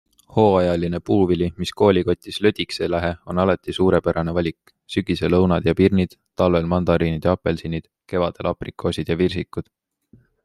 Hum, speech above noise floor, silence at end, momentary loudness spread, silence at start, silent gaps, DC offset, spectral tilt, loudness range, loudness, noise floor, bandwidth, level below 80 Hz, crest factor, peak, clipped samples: none; 35 dB; 0.8 s; 9 LU; 0.3 s; none; under 0.1%; -7.5 dB/octave; 3 LU; -21 LUFS; -55 dBFS; 12.5 kHz; -46 dBFS; 18 dB; -2 dBFS; under 0.1%